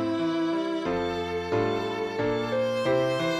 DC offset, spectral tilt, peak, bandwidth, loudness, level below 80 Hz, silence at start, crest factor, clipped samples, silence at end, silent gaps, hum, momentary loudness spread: under 0.1%; -6 dB/octave; -14 dBFS; 13 kHz; -27 LUFS; -54 dBFS; 0 s; 12 dB; under 0.1%; 0 s; none; none; 4 LU